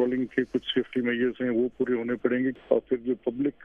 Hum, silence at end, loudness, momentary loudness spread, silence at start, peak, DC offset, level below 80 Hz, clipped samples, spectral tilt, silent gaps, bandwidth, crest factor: none; 0 s; -27 LUFS; 2 LU; 0 s; -8 dBFS; under 0.1%; -62 dBFS; under 0.1%; -7.5 dB/octave; none; 3.7 kHz; 20 dB